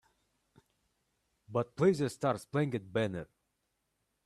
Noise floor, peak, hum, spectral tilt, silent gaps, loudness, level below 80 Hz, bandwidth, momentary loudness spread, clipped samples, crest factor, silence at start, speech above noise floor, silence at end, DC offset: -82 dBFS; -16 dBFS; none; -7 dB/octave; none; -33 LUFS; -70 dBFS; 13 kHz; 9 LU; under 0.1%; 20 dB; 1.5 s; 50 dB; 1 s; under 0.1%